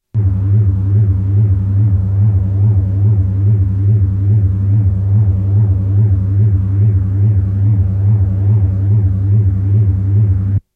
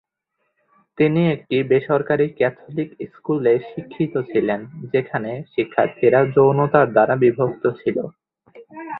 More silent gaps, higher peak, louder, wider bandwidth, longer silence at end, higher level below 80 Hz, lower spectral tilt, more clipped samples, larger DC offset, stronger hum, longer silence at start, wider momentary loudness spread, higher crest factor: neither; about the same, -4 dBFS vs -2 dBFS; first, -13 LUFS vs -19 LUFS; second, 1.8 kHz vs 4.6 kHz; first, 0.15 s vs 0 s; first, -28 dBFS vs -60 dBFS; about the same, -12.5 dB/octave vs -12 dB/octave; neither; neither; neither; second, 0.15 s vs 1 s; second, 1 LU vs 12 LU; second, 8 dB vs 18 dB